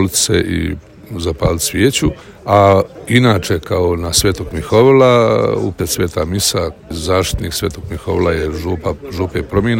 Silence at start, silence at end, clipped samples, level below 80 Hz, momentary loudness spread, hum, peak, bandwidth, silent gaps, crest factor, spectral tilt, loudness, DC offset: 0 s; 0 s; 0.2%; -34 dBFS; 12 LU; none; 0 dBFS; 17 kHz; none; 14 dB; -4.5 dB/octave; -15 LUFS; under 0.1%